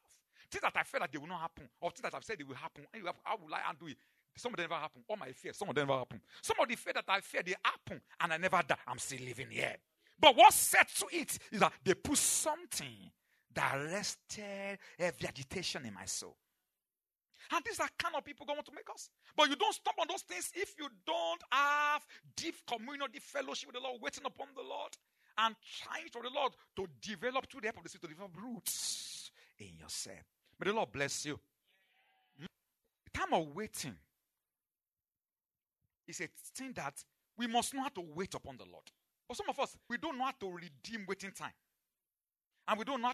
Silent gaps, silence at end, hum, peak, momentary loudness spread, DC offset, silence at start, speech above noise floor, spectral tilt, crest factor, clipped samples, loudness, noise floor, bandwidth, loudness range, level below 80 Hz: 42.46-42.50 s; 0 s; none; -8 dBFS; 17 LU; under 0.1%; 0.5 s; over 53 dB; -2 dB/octave; 30 dB; under 0.1%; -36 LUFS; under -90 dBFS; 13.5 kHz; 14 LU; -72 dBFS